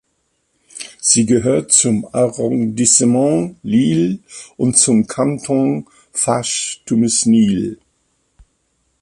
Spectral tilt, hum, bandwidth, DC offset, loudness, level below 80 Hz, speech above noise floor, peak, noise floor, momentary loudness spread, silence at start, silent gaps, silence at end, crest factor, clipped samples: -4 dB/octave; none; 11.5 kHz; under 0.1%; -15 LUFS; -52 dBFS; 51 dB; 0 dBFS; -66 dBFS; 10 LU; 0.75 s; none; 1.25 s; 16 dB; under 0.1%